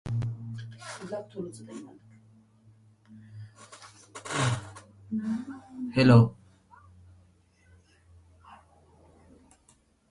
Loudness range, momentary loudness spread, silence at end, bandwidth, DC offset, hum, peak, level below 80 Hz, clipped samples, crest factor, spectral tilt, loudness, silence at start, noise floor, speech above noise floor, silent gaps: 17 LU; 28 LU; 1.55 s; 11.5 kHz; under 0.1%; none; -8 dBFS; -58 dBFS; under 0.1%; 24 dB; -6.5 dB/octave; -28 LUFS; 0.05 s; -64 dBFS; 39 dB; none